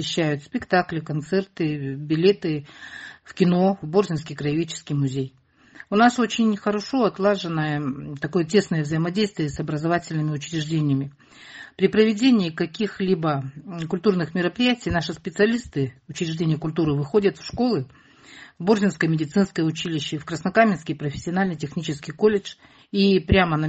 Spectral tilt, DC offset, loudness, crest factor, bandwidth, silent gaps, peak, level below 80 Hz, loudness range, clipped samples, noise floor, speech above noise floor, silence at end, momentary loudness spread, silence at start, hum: -6 dB/octave; under 0.1%; -23 LUFS; 20 dB; 8.6 kHz; none; -4 dBFS; -48 dBFS; 2 LU; under 0.1%; -48 dBFS; 26 dB; 0 s; 11 LU; 0 s; none